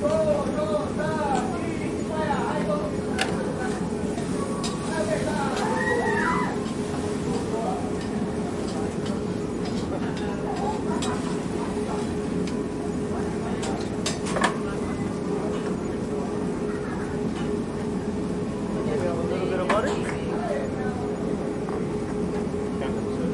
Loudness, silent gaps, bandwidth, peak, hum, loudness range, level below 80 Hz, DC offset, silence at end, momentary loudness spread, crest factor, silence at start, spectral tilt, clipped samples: -27 LUFS; none; 11.5 kHz; -6 dBFS; none; 3 LU; -46 dBFS; under 0.1%; 0 s; 5 LU; 20 dB; 0 s; -6 dB/octave; under 0.1%